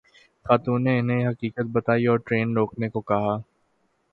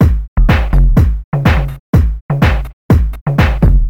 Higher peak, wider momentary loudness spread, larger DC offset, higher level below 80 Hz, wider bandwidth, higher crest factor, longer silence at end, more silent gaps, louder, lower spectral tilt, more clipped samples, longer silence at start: about the same, -4 dBFS vs -2 dBFS; first, 7 LU vs 4 LU; second, under 0.1% vs 1%; second, -58 dBFS vs -12 dBFS; second, 4.6 kHz vs 15 kHz; first, 20 dB vs 10 dB; first, 0.7 s vs 0 s; second, none vs 0.28-0.36 s, 1.24-1.32 s, 1.79-1.93 s, 2.21-2.29 s, 2.73-2.89 s, 3.21-3.26 s; second, -24 LUFS vs -13 LUFS; first, -10 dB/octave vs -8 dB/octave; neither; first, 0.45 s vs 0 s